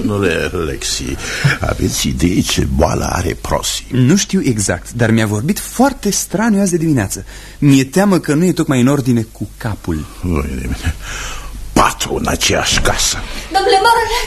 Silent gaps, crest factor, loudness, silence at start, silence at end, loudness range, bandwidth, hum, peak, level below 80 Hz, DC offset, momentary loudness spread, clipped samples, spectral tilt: none; 14 dB; -15 LUFS; 0 s; 0 s; 4 LU; 13 kHz; none; 0 dBFS; -28 dBFS; under 0.1%; 10 LU; under 0.1%; -4.5 dB/octave